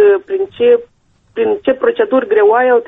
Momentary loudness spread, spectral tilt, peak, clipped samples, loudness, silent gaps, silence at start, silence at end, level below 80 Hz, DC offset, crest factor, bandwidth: 8 LU; -7 dB/octave; -2 dBFS; under 0.1%; -13 LUFS; none; 0 s; 0 s; -56 dBFS; under 0.1%; 10 dB; 3.9 kHz